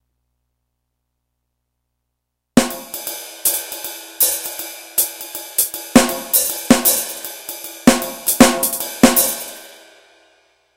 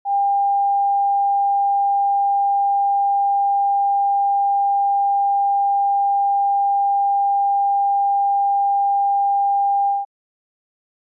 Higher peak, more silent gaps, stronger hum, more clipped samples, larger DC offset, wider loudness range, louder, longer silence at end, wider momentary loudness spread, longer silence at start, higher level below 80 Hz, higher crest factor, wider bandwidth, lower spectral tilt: first, 0 dBFS vs -14 dBFS; neither; first, 60 Hz at -45 dBFS vs none; first, 0.2% vs under 0.1%; neither; first, 8 LU vs 1 LU; about the same, -16 LUFS vs -18 LUFS; about the same, 1.05 s vs 1.05 s; first, 16 LU vs 0 LU; first, 2.55 s vs 0.05 s; first, -44 dBFS vs under -90 dBFS; first, 20 dB vs 4 dB; first, 17.5 kHz vs 0.9 kHz; second, -2.5 dB/octave vs -4 dB/octave